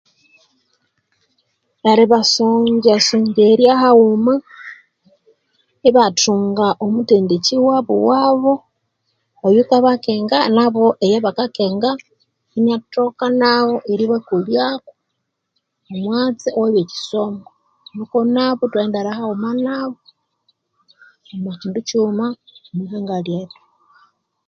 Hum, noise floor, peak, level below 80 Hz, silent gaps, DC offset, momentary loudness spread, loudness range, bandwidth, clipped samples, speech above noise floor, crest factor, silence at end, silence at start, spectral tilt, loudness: none; -74 dBFS; 0 dBFS; -64 dBFS; none; under 0.1%; 15 LU; 11 LU; 7.8 kHz; under 0.1%; 59 dB; 16 dB; 1 s; 1.85 s; -4.5 dB/octave; -16 LUFS